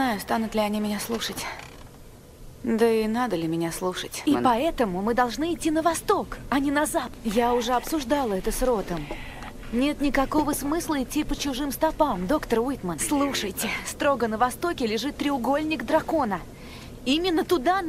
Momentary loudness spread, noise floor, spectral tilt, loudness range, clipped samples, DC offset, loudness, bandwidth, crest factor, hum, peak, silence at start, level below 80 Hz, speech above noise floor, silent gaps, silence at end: 7 LU; -46 dBFS; -4 dB/octave; 2 LU; under 0.1%; under 0.1%; -25 LUFS; 16 kHz; 18 dB; none; -6 dBFS; 0 s; -42 dBFS; 21 dB; none; 0 s